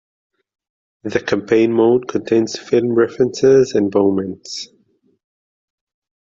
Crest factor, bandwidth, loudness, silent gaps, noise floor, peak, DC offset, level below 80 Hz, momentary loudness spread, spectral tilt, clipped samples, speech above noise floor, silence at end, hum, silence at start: 16 dB; 7.8 kHz; -16 LUFS; none; -60 dBFS; -2 dBFS; under 0.1%; -54 dBFS; 15 LU; -6 dB/octave; under 0.1%; 44 dB; 1.55 s; none; 1.05 s